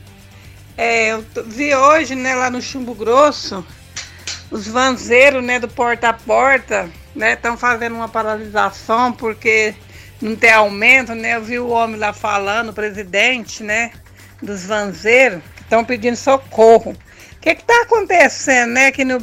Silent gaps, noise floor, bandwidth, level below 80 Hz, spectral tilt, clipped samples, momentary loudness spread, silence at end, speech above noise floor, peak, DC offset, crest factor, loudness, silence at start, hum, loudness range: none; -40 dBFS; 16 kHz; -46 dBFS; -3 dB/octave; under 0.1%; 16 LU; 0 s; 25 dB; 0 dBFS; under 0.1%; 16 dB; -14 LUFS; 0.35 s; none; 4 LU